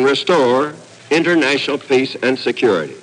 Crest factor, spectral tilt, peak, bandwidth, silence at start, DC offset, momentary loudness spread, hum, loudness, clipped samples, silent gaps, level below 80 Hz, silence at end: 12 dB; -4.5 dB/octave; -4 dBFS; 10.5 kHz; 0 s; under 0.1%; 5 LU; none; -16 LUFS; under 0.1%; none; -68 dBFS; 0 s